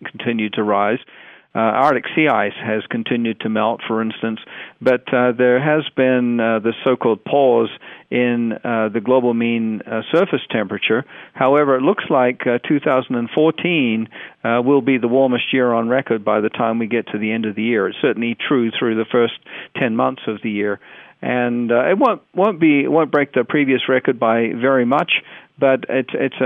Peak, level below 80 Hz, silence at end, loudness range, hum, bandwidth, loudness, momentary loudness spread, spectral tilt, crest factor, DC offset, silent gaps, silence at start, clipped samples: -4 dBFS; -68 dBFS; 0 s; 3 LU; none; 4.6 kHz; -18 LUFS; 7 LU; -8.5 dB/octave; 14 dB; under 0.1%; none; 0 s; under 0.1%